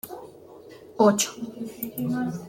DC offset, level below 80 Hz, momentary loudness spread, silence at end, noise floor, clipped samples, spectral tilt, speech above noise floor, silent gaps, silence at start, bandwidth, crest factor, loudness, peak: under 0.1%; -66 dBFS; 26 LU; 0 s; -47 dBFS; under 0.1%; -4.5 dB/octave; 22 dB; none; 0.05 s; 17 kHz; 20 dB; -25 LUFS; -6 dBFS